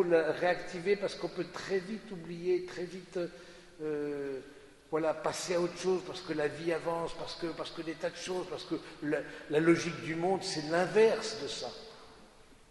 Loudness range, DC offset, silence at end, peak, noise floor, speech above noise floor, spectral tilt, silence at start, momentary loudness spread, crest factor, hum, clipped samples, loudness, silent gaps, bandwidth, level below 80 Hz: 6 LU; under 0.1%; 0.15 s; -14 dBFS; -57 dBFS; 24 dB; -4.5 dB/octave; 0 s; 14 LU; 20 dB; none; under 0.1%; -34 LUFS; none; 11.5 kHz; -64 dBFS